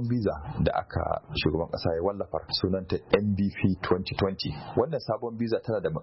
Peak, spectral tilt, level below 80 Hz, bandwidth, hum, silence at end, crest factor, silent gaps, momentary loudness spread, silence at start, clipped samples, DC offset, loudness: -10 dBFS; -10.5 dB/octave; -46 dBFS; 5.8 kHz; none; 0 s; 18 dB; none; 5 LU; 0 s; under 0.1%; under 0.1%; -29 LUFS